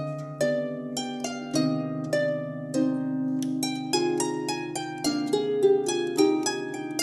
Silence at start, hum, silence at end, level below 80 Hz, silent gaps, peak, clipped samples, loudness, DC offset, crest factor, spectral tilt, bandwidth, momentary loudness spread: 0 s; none; 0 s; -70 dBFS; none; -10 dBFS; under 0.1%; -27 LUFS; under 0.1%; 18 dB; -4.5 dB/octave; 13 kHz; 9 LU